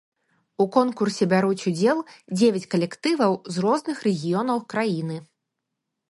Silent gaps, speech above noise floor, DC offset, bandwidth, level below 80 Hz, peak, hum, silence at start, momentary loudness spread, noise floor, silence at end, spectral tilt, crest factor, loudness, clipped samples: none; 59 dB; under 0.1%; 11.5 kHz; -70 dBFS; -4 dBFS; none; 0.6 s; 7 LU; -81 dBFS; 0.9 s; -6 dB/octave; 20 dB; -23 LUFS; under 0.1%